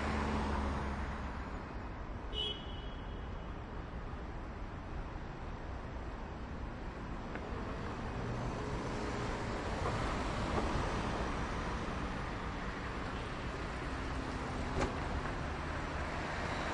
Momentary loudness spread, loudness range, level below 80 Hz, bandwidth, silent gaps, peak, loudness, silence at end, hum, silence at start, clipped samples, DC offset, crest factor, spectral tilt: 9 LU; 7 LU; -44 dBFS; 11 kHz; none; -22 dBFS; -40 LUFS; 0 s; none; 0 s; under 0.1%; under 0.1%; 18 dB; -5.5 dB/octave